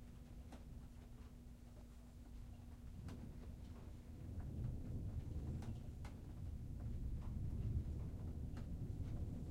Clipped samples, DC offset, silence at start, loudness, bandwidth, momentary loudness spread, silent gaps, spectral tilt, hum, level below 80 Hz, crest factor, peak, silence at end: under 0.1%; under 0.1%; 0 s; -51 LUFS; 16 kHz; 12 LU; none; -8 dB/octave; none; -52 dBFS; 16 dB; -32 dBFS; 0 s